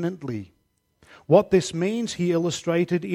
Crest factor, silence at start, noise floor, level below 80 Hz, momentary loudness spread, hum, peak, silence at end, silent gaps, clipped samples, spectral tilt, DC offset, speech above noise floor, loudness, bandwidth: 20 dB; 0 s; -63 dBFS; -58 dBFS; 14 LU; none; -4 dBFS; 0 s; none; under 0.1%; -6 dB/octave; under 0.1%; 40 dB; -23 LUFS; 14.5 kHz